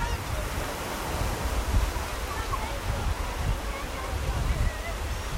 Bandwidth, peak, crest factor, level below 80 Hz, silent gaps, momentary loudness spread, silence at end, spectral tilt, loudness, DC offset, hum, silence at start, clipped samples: 16 kHz; -14 dBFS; 16 dB; -32 dBFS; none; 4 LU; 0 s; -4.5 dB/octave; -31 LUFS; under 0.1%; none; 0 s; under 0.1%